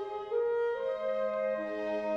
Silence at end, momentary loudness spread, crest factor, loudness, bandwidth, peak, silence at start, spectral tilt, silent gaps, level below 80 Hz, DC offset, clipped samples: 0 s; 4 LU; 10 dB; -33 LUFS; 6.8 kHz; -22 dBFS; 0 s; -6 dB/octave; none; -70 dBFS; under 0.1%; under 0.1%